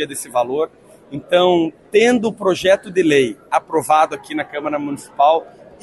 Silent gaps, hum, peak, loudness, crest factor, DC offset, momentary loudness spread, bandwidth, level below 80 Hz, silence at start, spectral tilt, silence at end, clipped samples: none; none; -2 dBFS; -17 LUFS; 14 dB; under 0.1%; 10 LU; 12.5 kHz; -58 dBFS; 0 s; -4.5 dB/octave; 0.35 s; under 0.1%